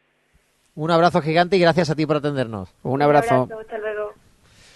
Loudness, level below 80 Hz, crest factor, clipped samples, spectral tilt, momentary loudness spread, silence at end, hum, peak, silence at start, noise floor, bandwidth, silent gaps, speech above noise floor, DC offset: -20 LUFS; -54 dBFS; 20 dB; under 0.1%; -6.5 dB/octave; 13 LU; 0.65 s; none; -2 dBFS; 0.75 s; -62 dBFS; 12 kHz; none; 44 dB; under 0.1%